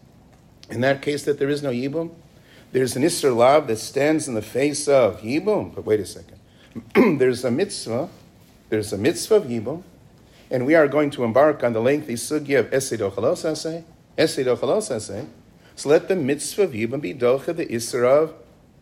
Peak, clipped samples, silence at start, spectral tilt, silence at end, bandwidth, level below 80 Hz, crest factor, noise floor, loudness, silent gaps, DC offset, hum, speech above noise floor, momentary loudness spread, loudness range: -4 dBFS; under 0.1%; 0.7 s; -5 dB/octave; 0.45 s; 16 kHz; -58 dBFS; 18 dB; -51 dBFS; -21 LUFS; none; under 0.1%; none; 30 dB; 12 LU; 3 LU